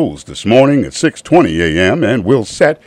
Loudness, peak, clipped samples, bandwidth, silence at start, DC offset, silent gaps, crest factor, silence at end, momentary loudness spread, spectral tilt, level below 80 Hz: -12 LUFS; 0 dBFS; 0.2%; 11.5 kHz; 0 s; under 0.1%; none; 12 dB; 0.1 s; 7 LU; -5.5 dB/octave; -38 dBFS